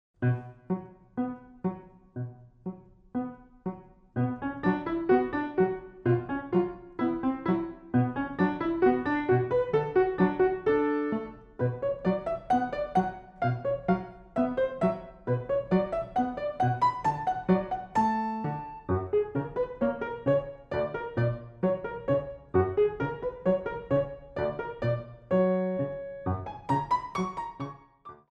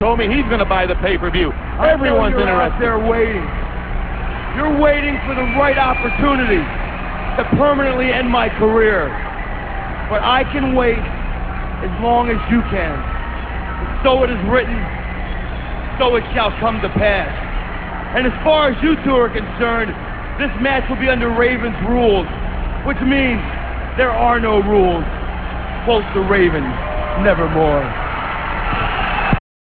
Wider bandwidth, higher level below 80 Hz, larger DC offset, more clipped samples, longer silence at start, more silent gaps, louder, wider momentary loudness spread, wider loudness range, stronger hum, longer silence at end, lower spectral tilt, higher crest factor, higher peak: first, 8.6 kHz vs 4.7 kHz; second, -54 dBFS vs -24 dBFS; second, under 0.1% vs 0.7%; neither; first, 0.2 s vs 0 s; neither; second, -29 LUFS vs -17 LUFS; about the same, 10 LU vs 11 LU; about the same, 4 LU vs 3 LU; second, none vs 60 Hz at -30 dBFS; second, 0.15 s vs 0.35 s; about the same, -9 dB/octave vs -9.5 dB/octave; about the same, 18 dB vs 16 dB; second, -12 dBFS vs 0 dBFS